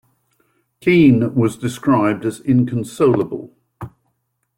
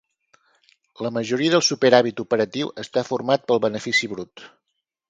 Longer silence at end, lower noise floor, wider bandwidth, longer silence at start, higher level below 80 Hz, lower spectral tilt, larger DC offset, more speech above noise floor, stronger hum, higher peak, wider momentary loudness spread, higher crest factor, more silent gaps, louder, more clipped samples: about the same, 0.7 s vs 0.65 s; second, -70 dBFS vs -79 dBFS; first, 16 kHz vs 9.2 kHz; second, 0.85 s vs 1 s; first, -54 dBFS vs -66 dBFS; first, -7.5 dB/octave vs -4 dB/octave; neither; about the same, 54 dB vs 57 dB; neither; about the same, -2 dBFS vs 0 dBFS; first, 23 LU vs 13 LU; second, 16 dB vs 22 dB; neither; first, -17 LUFS vs -21 LUFS; neither